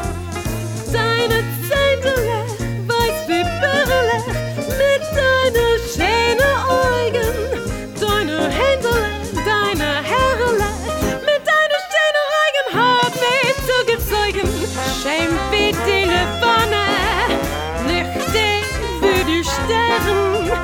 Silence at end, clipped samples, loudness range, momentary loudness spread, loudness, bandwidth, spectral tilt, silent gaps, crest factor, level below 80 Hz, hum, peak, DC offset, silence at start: 0 s; under 0.1%; 2 LU; 7 LU; -17 LUFS; 19.5 kHz; -4 dB/octave; none; 14 dB; -32 dBFS; none; -4 dBFS; under 0.1%; 0 s